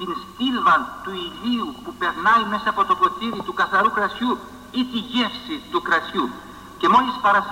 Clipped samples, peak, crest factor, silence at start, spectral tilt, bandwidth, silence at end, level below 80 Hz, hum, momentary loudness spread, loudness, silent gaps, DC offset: under 0.1%; -6 dBFS; 16 dB; 0 s; -4.5 dB/octave; 16 kHz; 0 s; -54 dBFS; none; 12 LU; -21 LUFS; none; under 0.1%